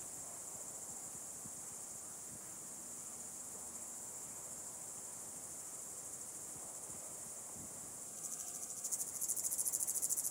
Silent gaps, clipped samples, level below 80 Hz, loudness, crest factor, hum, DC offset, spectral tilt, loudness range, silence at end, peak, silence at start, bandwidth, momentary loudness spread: none; under 0.1%; -78 dBFS; -43 LUFS; 28 dB; none; under 0.1%; -1 dB/octave; 6 LU; 0 s; -18 dBFS; 0 s; 16 kHz; 11 LU